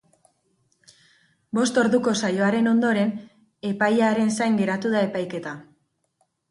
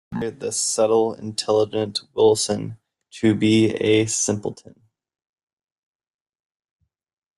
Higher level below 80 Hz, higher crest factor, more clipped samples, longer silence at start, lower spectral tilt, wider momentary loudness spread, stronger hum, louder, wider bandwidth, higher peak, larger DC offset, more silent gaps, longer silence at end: second, -68 dBFS vs -60 dBFS; about the same, 16 dB vs 18 dB; neither; first, 1.55 s vs 0.1 s; about the same, -5 dB/octave vs -4 dB/octave; first, 13 LU vs 10 LU; neither; about the same, -22 LUFS vs -20 LUFS; about the same, 11.5 kHz vs 12.5 kHz; second, -8 dBFS vs -4 dBFS; neither; neither; second, 0.9 s vs 2.85 s